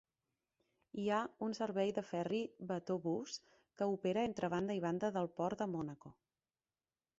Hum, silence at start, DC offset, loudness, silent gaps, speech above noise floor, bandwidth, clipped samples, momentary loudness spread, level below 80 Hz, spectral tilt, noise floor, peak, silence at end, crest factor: none; 0.95 s; under 0.1%; -40 LUFS; none; over 51 dB; 8 kHz; under 0.1%; 7 LU; -76 dBFS; -5.5 dB/octave; under -90 dBFS; -24 dBFS; 1.05 s; 18 dB